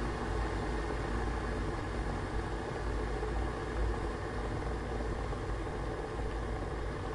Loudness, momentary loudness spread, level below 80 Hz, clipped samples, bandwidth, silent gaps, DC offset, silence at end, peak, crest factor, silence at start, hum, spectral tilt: -37 LUFS; 2 LU; -38 dBFS; under 0.1%; 11 kHz; none; under 0.1%; 0 s; -22 dBFS; 12 dB; 0 s; none; -6.5 dB/octave